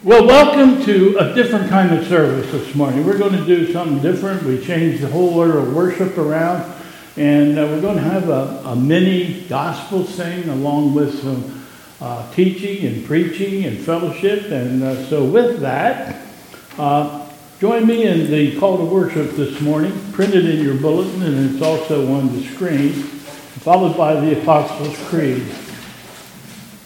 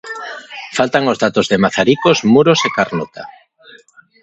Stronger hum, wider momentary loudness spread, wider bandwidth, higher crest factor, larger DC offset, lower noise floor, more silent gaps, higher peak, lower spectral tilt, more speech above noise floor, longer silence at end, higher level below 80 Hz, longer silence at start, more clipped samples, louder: neither; second, 15 LU vs 18 LU; first, 17 kHz vs 8.2 kHz; about the same, 16 dB vs 16 dB; neither; second, -38 dBFS vs -46 dBFS; neither; about the same, 0 dBFS vs 0 dBFS; first, -7 dB/octave vs -5 dB/octave; second, 23 dB vs 32 dB; second, 0.05 s vs 0.9 s; about the same, -50 dBFS vs -54 dBFS; about the same, 0.05 s vs 0.05 s; neither; about the same, -16 LUFS vs -14 LUFS